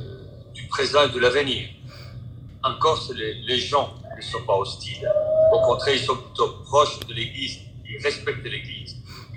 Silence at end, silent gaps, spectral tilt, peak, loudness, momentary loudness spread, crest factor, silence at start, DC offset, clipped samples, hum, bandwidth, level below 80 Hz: 0 s; none; -4 dB/octave; -4 dBFS; -23 LUFS; 20 LU; 20 dB; 0 s; under 0.1%; under 0.1%; none; 13.5 kHz; -50 dBFS